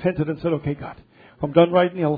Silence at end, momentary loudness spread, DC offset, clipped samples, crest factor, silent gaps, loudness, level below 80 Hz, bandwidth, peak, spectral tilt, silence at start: 0 s; 15 LU; under 0.1%; under 0.1%; 20 dB; none; -21 LUFS; -52 dBFS; 4.9 kHz; -2 dBFS; -11 dB/octave; 0 s